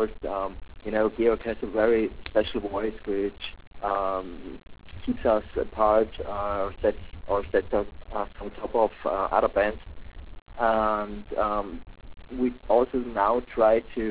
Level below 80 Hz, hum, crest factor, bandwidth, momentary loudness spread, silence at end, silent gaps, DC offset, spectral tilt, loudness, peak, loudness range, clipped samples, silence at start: -44 dBFS; none; 18 dB; 4 kHz; 16 LU; 0 s; 3.67-3.71 s, 10.42-10.46 s; 0.4%; -9.5 dB/octave; -27 LUFS; -8 dBFS; 2 LU; under 0.1%; 0 s